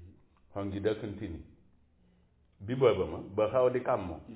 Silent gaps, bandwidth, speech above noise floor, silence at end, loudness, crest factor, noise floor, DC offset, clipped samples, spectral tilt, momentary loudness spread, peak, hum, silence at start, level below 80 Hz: none; 4 kHz; 35 dB; 0 s; -31 LUFS; 20 dB; -66 dBFS; under 0.1%; under 0.1%; -6 dB/octave; 16 LU; -12 dBFS; none; 0 s; -54 dBFS